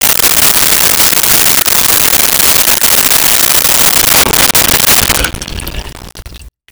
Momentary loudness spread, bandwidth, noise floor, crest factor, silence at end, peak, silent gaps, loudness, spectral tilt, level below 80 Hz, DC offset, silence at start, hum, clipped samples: 8 LU; over 20 kHz; -31 dBFS; 8 dB; 0.2 s; 0 dBFS; none; -5 LUFS; -0.5 dB/octave; -28 dBFS; under 0.1%; 0 s; none; under 0.1%